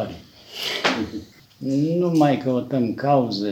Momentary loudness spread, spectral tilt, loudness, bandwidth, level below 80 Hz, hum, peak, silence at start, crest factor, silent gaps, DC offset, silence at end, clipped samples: 14 LU; -6 dB/octave; -22 LUFS; 18.5 kHz; -58 dBFS; none; -4 dBFS; 0 s; 18 dB; none; under 0.1%; 0 s; under 0.1%